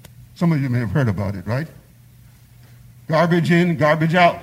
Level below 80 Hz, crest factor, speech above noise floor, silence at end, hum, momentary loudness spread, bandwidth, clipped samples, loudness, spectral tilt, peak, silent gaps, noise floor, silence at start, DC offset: -52 dBFS; 16 dB; 30 dB; 0 s; none; 10 LU; 15.5 kHz; under 0.1%; -19 LUFS; -7.5 dB/octave; -2 dBFS; none; -47 dBFS; 0.2 s; under 0.1%